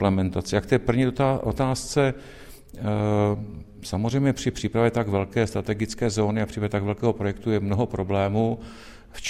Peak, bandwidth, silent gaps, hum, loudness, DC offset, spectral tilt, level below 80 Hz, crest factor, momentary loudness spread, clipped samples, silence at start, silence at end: -4 dBFS; 14 kHz; none; none; -25 LUFS; under 0.1%; -6.5 dB/octave; -44 dBFS; 20 dB; 11 LU; under 0.1%; 0 s; 0 s